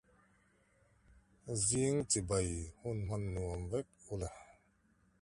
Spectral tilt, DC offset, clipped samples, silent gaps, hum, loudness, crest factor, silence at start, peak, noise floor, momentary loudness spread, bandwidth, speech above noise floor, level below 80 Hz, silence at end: -4.5 dB/octave; under 0.1%; under 0.1%; none; none; -37 LUFS; 20 dB; 1.45 s; -20 dBFS; -72 dBFS; 13 LU; 11.5 kHz; 35 dB; -54 dBFS; 0.7 s